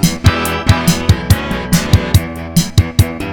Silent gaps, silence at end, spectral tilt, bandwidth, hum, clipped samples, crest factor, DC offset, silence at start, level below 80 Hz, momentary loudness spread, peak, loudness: none; 0 s; -5 dB/octave; over 20 kHz; none; 0.8%; 12 dB; under 0.1%; 0 s; -22 dBFS; 3 LU; 0 dBFS; -14 LUFS